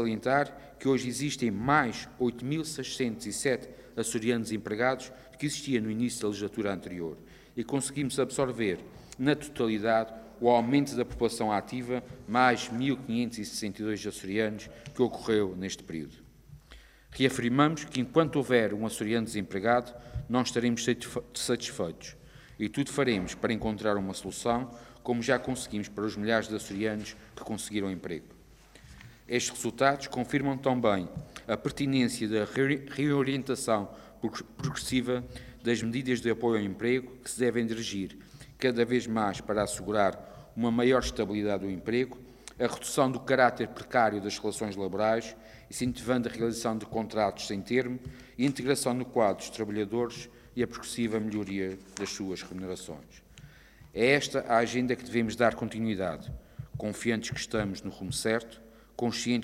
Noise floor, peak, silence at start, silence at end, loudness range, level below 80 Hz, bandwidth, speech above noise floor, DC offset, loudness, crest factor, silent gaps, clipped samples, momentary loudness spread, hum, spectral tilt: -55 dBFS; -8 dBFS; 0 s; 0 s; 4 LU; -56 dBFS; 16 kHz; 25 dB; under 0.1%; -30 LUFS; 22 dB; none; under 0.1%; 12 LU; none; -5 dB/octave